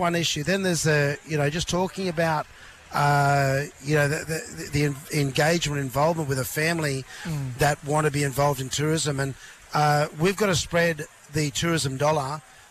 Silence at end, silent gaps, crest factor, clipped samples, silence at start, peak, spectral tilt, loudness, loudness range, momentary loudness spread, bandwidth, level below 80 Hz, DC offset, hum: 0.3 s; none; 12 dB; under 0.1%; 0 s; -12 dBFS; -4.5 dB/octave; -24 LUFS; 1 LU; 9 LU; 15 kHz; -50 dBFS; under 0.1%; none